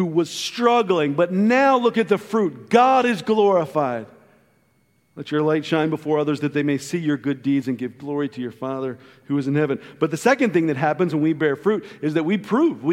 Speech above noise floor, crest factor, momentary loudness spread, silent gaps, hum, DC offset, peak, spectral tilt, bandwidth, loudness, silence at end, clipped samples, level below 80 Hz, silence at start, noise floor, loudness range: 43 dB; 18 dB; 11 LU; none; none; under 0.1%; -2 dBFS; -6 dB/octave; 15.5 kHz; -21 LUFS; 0 s; under 0.1%; -70 dBFS; 0 s; -63 dBFS; 6 LU